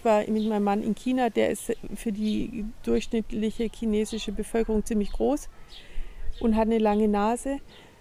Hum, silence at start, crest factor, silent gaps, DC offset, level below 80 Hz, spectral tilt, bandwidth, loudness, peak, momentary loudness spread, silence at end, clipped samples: none; 0 s; 14 dB; none; under 0.1%; -38 dBFS; -6 dB/octave; 15.5 kHz; -27 LUFS; -12 dBFS; 11 LU; 0.15 s; under 0.1%